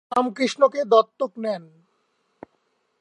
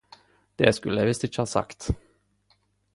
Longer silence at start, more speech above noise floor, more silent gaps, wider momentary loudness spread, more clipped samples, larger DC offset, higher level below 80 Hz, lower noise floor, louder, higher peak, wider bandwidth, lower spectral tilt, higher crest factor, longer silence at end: second, 0.1 s vs 0.6 s; first, 49 dB vs 43 dB; neither; about the same, 11 LU vs 11 LU; neither; neither; second, -74 dBFS vs -44 dBFS; about the same, -70 dBFS vs -67 dBFS; first, -22 LUFS vs -26 LUFS; about the same, -4 dBFS vs -4 dBFS; about the same, 11 kHz vs 11.5 kHz; about the same, -4 dB/octave vs -5 dB/octave; about the same, 20 dB vs 24 dB; first, 1.4 s vs 0.95 s